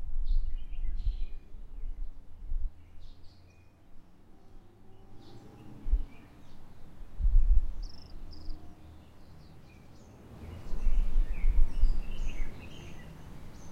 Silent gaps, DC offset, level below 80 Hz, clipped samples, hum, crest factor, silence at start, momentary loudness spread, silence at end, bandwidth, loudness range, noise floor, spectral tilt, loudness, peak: none; under 0.1%; -32 dBFS; under 0.1%; none; 18 dB; 0 s; 23 LU; 0 s; 5.6 kHz; 13 LU; -55 dBFS; -6.5 dB/octave; -38 LUFS; -10 dBFS